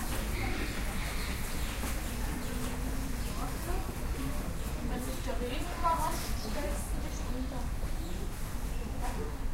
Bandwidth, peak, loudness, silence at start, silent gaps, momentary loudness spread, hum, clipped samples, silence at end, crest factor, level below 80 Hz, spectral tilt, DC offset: 16 kHz; -16 dBFS; -37 LUFS; 0 s; none; 5 LU; none; under 0.1%; 0 s; 16 dB; -36 dBFS; -4.5 dB/octave; under 0.1%